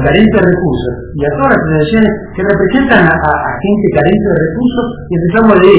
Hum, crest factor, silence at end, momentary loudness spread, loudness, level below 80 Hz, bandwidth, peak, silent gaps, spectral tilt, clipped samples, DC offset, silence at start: none; 10 dB; 0 s; 8 LU; -10 LUFS; -28 dBFS; 4 kHz; 0 dBFS; none; -11 dB/octave; 2%; 1%; 0 s